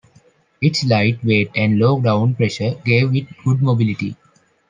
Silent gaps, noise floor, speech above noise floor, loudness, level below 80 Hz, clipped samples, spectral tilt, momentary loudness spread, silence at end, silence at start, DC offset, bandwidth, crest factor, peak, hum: none; -54 dBFS; 37 dB; -17 LUFS; -58 dBFS; under 0.1%; -7 dB/octave; 5 LU; 0.55 s; 0.6 s; under 0.1%; 9 kHz; 16 dB; -2 dBFS; none